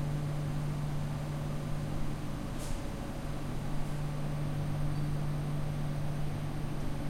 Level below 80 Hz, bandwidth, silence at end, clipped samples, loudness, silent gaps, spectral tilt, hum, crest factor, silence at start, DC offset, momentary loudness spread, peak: -40 dBFS; 16 kHz; 0 s; under 0.1%; -37 LUFS; none; -7 dB/octave; none; 12 dB; 0 s; under 0.1%; 4 LU; -22 dBFS